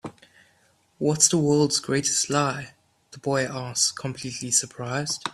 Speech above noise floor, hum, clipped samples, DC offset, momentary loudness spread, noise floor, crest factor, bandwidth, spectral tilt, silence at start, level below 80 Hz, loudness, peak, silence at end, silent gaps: 39 dB; none; under 0.1%; under 0.1%; 14 LU; -63 dBFS; 22 dB; 13.5 kHz; -3 dB/octave; 0.05 s; -62 dBFS; -23 LUFS; -4 dBFS; 0 s; none